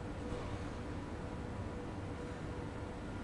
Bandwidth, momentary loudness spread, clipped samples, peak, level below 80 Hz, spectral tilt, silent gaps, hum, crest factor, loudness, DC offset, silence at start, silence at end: 11.5 kHz; 2 LU; under 0.1%; -28 dBFS; -50 dBFS; -7 dB/octave; none; none; 14 dB; -44 LUFS; under 0.1%; 0 s; 0 s